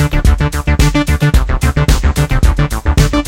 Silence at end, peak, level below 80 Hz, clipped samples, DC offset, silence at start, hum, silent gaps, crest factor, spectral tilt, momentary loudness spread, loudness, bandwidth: 0 s; 0 dBFS; -14 dBFS; under 0.1%; under 0.1%; 0 s; none; none; 10 dB; -5.5 dB/octave; 2 LU; -13 LUFS; 16.5 kHz